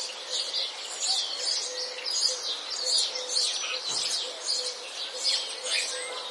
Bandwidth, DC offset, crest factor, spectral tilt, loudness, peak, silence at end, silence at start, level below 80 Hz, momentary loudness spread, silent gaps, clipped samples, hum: 12 kHz; under 0.1%; 20 dB; 3 dB/octave; -27 LUFS; -12 dBFS; 0 s; 0 s; under -90 dBFS; 6 LU; none; under 0.1%; none